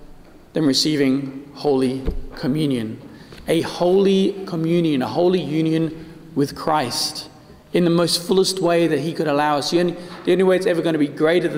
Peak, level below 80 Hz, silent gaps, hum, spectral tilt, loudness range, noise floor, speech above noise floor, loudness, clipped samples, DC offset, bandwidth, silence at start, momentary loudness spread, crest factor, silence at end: -6 dBFS; -40 dBFS; none; none; -5 dB/octave; 3 LU; -42 dBFS; 24 dB; -20 LUFS; under 0.1%; under 0.1%; 16 kHz; 0 s; 10 LU; 14 dB; 0 s